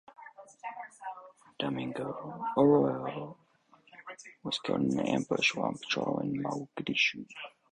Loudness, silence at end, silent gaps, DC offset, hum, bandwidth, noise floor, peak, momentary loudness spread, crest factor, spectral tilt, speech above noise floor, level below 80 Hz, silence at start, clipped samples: -31 LUFS; 0.25 s; none; under 0.1%; none; 10.5 kHz; -64 dBFS; -12 dBFS; 20 LU; 20 dB; -5 dB/octave; 33 dB; -70 dBFS; 0.1 s; under 0.1%